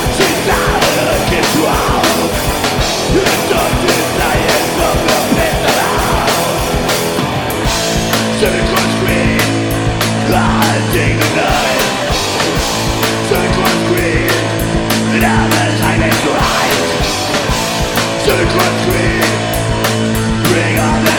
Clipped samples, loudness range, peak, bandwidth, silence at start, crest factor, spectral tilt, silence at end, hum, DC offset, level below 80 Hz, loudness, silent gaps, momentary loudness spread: under 0.1%; 1 LU; 0 dBFS; over 20 kHz; 0 s; 12 dB; -4 dB/octave; 0 s; none; under 0.1%; -26 dBFS; -12 LUFS; none; 3 LU